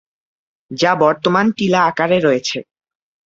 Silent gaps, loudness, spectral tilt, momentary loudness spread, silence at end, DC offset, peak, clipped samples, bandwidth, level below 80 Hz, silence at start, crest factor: none; -15 LUFS; -5 dB/octave; 9 LU; 0.65 s; under 0.1%; -2 dBFS; under 0.1%; 8 kHz; -58 dBFS; 0.7 s; 16 dB